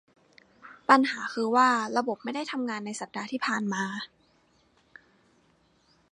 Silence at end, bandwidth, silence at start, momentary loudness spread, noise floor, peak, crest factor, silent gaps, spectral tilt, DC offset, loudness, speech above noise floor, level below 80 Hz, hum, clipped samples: 2.05 s; 11 kHz; 0.65 s; 14 LU; -66 dBFS; -4 dBFS; 26 dB; none; -4 dB/octave; under 0.1%; -27 LUFS; 39 dB; -78 dBFS; none; under 0.1%